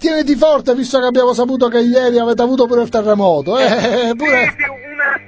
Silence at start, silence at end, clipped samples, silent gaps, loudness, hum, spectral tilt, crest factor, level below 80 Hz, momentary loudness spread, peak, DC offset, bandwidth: 0 s; 0.05 s; under 0.1%; none; -13 LUFS; none; -5 dB/octave; 12 dB; -48 dBFS; 3 LU; 0 dBFS; under 0.1%; 8 kHz